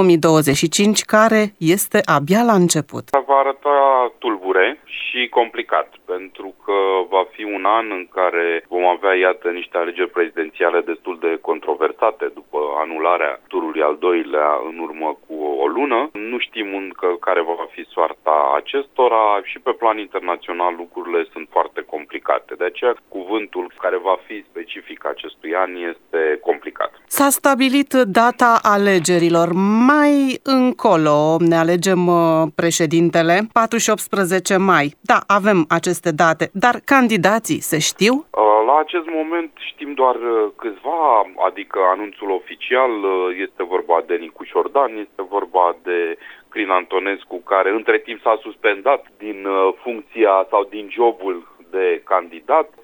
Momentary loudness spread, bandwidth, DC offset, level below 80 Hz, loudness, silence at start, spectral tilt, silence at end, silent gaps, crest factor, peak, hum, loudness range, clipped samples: 11 LU; over 20 kHz; under 0.1%; -64 dBFS; -18 LUFS; 0 s; -4.5 dB/octave; 0.15 s; none; 18 dB; 0 dBFS; none; 7 LU; under 0.1%